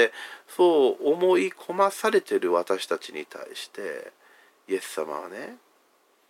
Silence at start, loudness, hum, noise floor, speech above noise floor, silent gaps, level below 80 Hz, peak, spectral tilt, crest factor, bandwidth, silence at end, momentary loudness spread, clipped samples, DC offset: 0 s; -25 LUFS; none; -64 dBFS; 39 dB; none; under -90 dBFS; -6 dBFS; -4 dB/octave; 20 dB; 16 kHz; 0.75 s; 17 LU; under 0.1%; under 0.1%